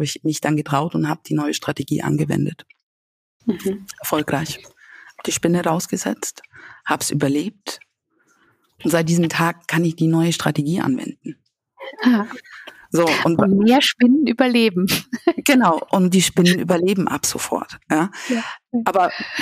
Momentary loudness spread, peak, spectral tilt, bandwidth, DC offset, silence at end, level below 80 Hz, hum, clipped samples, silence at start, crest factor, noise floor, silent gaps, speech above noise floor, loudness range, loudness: 13 LU; -2 dBFS; -5 dB/octave; 15.5 kHz; under 0.1%; 0 s; -58 dBFS; none; under 0.1%; 0 s; 18 dB; -63 dBFS; 2.83-3.40 s; 44 dB; 8 LU; -19 LUFS